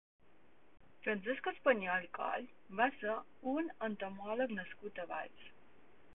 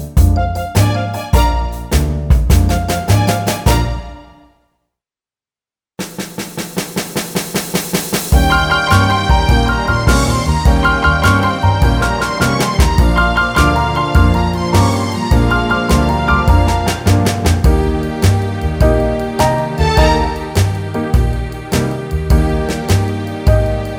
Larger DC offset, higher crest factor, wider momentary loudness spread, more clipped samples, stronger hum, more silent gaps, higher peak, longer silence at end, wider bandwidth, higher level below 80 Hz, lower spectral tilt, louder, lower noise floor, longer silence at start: first, 0.2% vs under 0.1%; first, 22 dB vs 14 dB; first, 13 LU vs 7 LU; neither; neither; neither; second, -18 dBFS vs 0 dBFS; first, 0.65 s vs 0 s; second, 3.9 kHz vs over 20 kHz; second, -78 dBFS vs -18 dBFS; second, 0.5 dB/octave vs -5.5 dB/octave; second, -39 LUFS vs -14 LUFS; second, -69 dBFS vs under -90 dBFS; first, 0.2 s vs 0 s